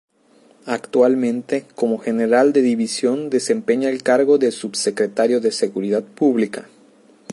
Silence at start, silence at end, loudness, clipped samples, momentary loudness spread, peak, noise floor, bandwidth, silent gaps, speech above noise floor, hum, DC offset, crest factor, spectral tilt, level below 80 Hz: 0.65 s; 0 s; -19 LUFS; under 0.1%; 8 LU; -2 dBFS; -53 dBFS; 11.5 kHz; none; 36 dB; none; under 0.1%; 16 dB; -4.5 dB/octave; -72 dBFS